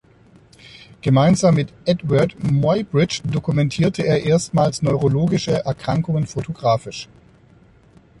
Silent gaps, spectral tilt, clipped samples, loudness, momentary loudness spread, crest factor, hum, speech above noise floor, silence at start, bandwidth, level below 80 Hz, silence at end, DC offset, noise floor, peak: none; -6.5 dB/octave; under 0.1%; -19 LUFS; 7 LU; 16 dB; none; 32 dB; 0.65 s; 11.5 kHz; -46 dBFS; 1.15 s; under 0.1%; -50 dBFS; -4 dBFS